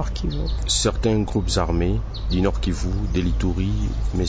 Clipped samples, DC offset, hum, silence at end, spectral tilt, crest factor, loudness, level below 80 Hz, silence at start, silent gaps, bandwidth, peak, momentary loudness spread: under 0.1%; under 0.1%; none; 0 s; -5 dB/octave; 14 dB; -23 LUFS; -24 dBFS; 0 s; none; 8 kHz; -8 dBFS; 6 LU